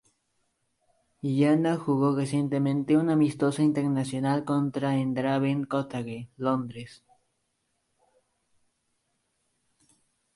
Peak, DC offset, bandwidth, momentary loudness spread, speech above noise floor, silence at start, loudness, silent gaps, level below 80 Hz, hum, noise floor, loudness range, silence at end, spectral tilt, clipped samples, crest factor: -12 dBFS; under 0.1%; 11.5 kHz; 11 LU; 51 dB; 1.25 s; -26 LUFS; none; -70 dBFS; none; -76 dBFS; 12 LU; 3.45 s; -7.5 dB/octave; under 0.1%; 16 dB